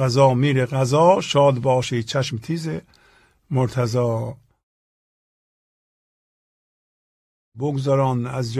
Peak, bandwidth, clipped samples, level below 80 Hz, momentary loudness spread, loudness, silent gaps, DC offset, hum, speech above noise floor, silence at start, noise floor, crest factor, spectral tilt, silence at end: -2 dBFS; 12.5 kHz; under 0.1%; -56 dBFS; 11 LU; -20 LUFS; 4.63-7.52 s; under 0.1%; none; 37 dB; 0 s; -57 dBFS; 20 dB; -6.5 dB/octave; 0 s